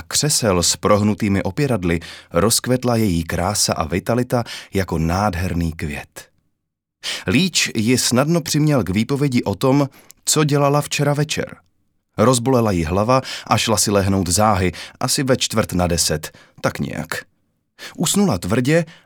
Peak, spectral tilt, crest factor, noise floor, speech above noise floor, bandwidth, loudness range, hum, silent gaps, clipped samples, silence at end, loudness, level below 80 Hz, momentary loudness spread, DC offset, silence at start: 0 dBFS; -4.5 dB/octave; 18 dB; -75 dBFS; 57 dB; over 20 kHz; 4 LU; none; none; under 0.1%; 0.15 s; -18 LUFS; -40 dBFS; 10 LU; under 0.1%; 0 s